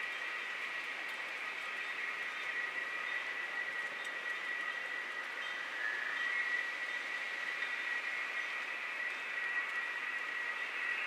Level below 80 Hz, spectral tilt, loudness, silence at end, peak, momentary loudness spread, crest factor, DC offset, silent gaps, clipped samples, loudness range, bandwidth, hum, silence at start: under -90 dBFS; 0 dB/octave; -37 LUFS; 0 s; -24 dBFS; 4 LU; 14 dB; under 0.1%; none; under 0.1%; 2 LU; 16 kHz; none; 0 s